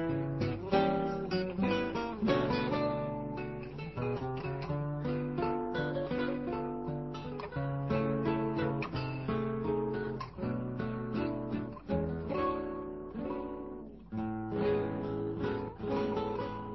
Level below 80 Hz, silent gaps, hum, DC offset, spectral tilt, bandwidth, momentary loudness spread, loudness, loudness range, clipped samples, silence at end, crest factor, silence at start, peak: -52 dBFS; none; none; under 0.1%; -6 dB/octave; 6 kHz; 8 LU; -35 LUFS; 4 LU; under 0.1%; 0 s; 18 dB; 0 s; -16 dBFS